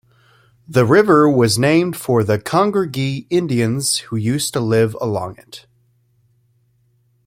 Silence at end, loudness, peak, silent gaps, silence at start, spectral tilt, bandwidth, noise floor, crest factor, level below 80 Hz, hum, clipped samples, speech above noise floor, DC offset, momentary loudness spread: 1.7 s; -16 LUFS; -2 dBFS; none; 0.7 s; -5.5 dB/octave; 16.5 kHz; -60 dBFS; 16 dB; -54 dBFS; none; under 0.1%; 44 dB; under 0.1%; 10 LU